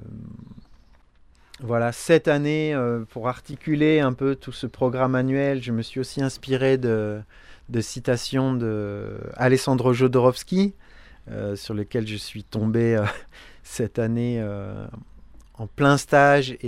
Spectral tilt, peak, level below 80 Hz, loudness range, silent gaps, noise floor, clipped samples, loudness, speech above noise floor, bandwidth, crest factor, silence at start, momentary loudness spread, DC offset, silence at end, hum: -6.5 dB/octave; -4 dBFS; -50 dBFS; 4 LU; none; -54 dBFS; under 0.1%; -23 LUFS; 31 dB; 15 kHz; 20 dB; 0 s; 16 LU; under 0.1%; 0 s; none